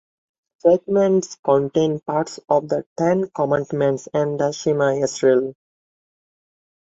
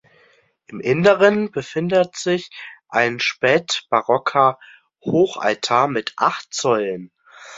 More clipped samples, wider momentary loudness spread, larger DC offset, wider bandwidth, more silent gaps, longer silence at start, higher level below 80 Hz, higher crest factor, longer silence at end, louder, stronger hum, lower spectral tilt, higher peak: neither; second, 5 LU vs 12 LU; neither; about the same, 8 kHz vs 7.8 kHz; first, 1.39-1.43 s, 2.86-2.96 s vs none; about the same, 0.65 s vs 0.7 s; about the same, -62 dBFS vs -62 dBFS; about the same, 18 dB vs 18 dB; first, 1.35 s vs 0 s; about the same, -20 LUFS vs -19 LUFS; neither; first, -6 dB/octave vs -4.5 dB/octave; about the same, -4 dBFS vs -2 dBFS